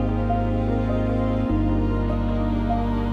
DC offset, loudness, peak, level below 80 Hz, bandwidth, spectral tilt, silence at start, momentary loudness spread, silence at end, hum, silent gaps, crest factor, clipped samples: under 0.1%; -23 LUFS; -10 dBFS; -28 dBFS; 5.2 kHz; -9.5 dB/octave; 0 s; 2 LU; 0 s; none; none; 10 dB; under 0.1%